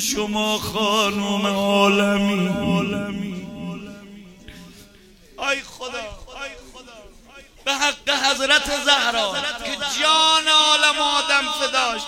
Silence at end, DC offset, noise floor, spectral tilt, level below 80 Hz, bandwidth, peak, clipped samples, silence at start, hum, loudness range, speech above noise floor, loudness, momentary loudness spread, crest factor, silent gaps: 0 s; under 0.1%; -49 dBFS; -2.5 dB/octave; -48 dBFS; 16.5 kHz; 0 dBFS; under 0.1%; 0 s; none; 14 LU; 29 dB; -18 LUFS; 18 LU; 22 dB; none